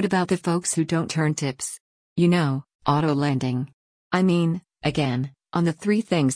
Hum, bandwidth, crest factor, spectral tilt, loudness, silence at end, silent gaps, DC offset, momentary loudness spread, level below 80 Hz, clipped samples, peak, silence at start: none; 10.5 kHz; 16 dB; -5.5 dB/octave; -24 LUFS; 0 s; 1.80-2.16 s, 2.75-2.79 s, 3.73-4.11 s; under 0.1%; 9 LU; -58 dBFS; under 0.1%; -8 dBFS; 0 s